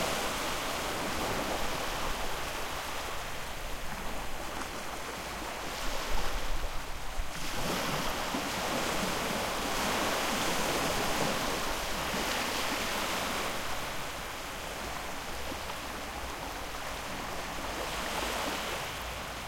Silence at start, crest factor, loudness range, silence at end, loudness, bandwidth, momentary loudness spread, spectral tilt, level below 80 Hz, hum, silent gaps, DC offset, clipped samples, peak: 0 s; 16 dB; 7 LU; 0 s; -34 LUFS; 16.5 kHz; 8 LU; -2.5 dB/octave; -44 dBFS; none; none; under 0.1%; under 0.1%; -16 dBFS